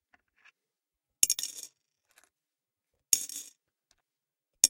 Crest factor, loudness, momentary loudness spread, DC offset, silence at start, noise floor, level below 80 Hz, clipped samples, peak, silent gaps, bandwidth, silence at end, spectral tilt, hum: 36 dB; -29 LUFS; 21 LU; under 0.1%; 1.2 s; under -90 dBFS; -72 dBFS; under 0.1%; 0 dBFS; none; 16.5 kHz; 0 s; 2.5 dB/octave; none